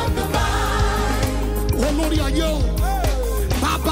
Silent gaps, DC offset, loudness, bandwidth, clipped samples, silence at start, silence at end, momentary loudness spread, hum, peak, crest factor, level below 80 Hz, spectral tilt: none; under 0.1%; -21 LUFS; 16.5 kHz; under 0.1%; 0 s; 0 s; 2 LU; none; -8 dBFS; 12 dB; -22 dBFS; -5 dB/octave